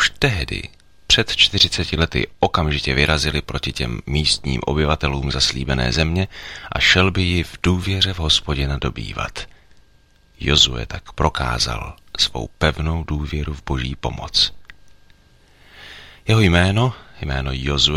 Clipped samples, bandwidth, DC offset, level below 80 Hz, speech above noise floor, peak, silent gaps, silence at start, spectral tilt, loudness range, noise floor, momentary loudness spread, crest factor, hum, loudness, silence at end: under 0.1%; 15.5 kHz; under 0.1%; -30 dBFS; 34 dB; 0 dBFS; none; 0 s; -4 dB/octave; 5 LU; -54 dBFS; 13 LU; 20 dB; none; -19 LUFS; 0 s